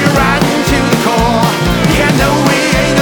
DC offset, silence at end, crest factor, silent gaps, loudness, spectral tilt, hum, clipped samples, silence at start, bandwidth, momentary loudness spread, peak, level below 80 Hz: under 0.1%; 0 s; 10 dB; none; -10 LUFS; -5 dB/octave; none; under 0.1%; 0 s; over 20 kHz; 2 LU; 0 dBFS; -24 dBFS